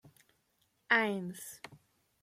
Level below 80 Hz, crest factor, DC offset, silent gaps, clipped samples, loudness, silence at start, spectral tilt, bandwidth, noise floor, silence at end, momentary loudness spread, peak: -82 dBFS; 24 dB; under 0.1%; none; under 0.1%; -32 LUFS; 0.9 s; -4 dB/octave; 16.5 kHz; -76 dBFS; 0.45 s; 22 LU; -12 dBFS